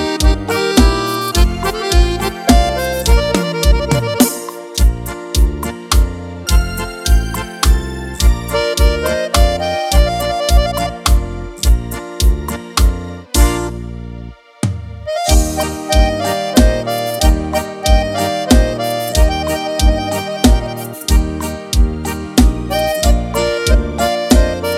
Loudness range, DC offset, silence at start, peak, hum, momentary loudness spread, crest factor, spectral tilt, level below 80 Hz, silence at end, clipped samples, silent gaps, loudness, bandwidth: 3 LU; under 0.1%; 0 s; 0 dBFS; none; 9 LU; 14 dB; -5 dB/octave; -16 dBFS; 0 s; under 0.1%; none; -15 LUFS; 16 kHz